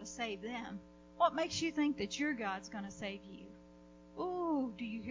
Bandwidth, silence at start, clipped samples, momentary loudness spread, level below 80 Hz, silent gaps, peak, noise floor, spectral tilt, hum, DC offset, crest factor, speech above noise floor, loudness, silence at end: 7.6 kHz; 0 s; under 0.1%; 19 LU; -66 dBFS; none; -18 dBFS; -59 dBFS; -4 dB/octave; none; under 0.1%; 22 dB; 20 dB; -38 LUFS; 0 s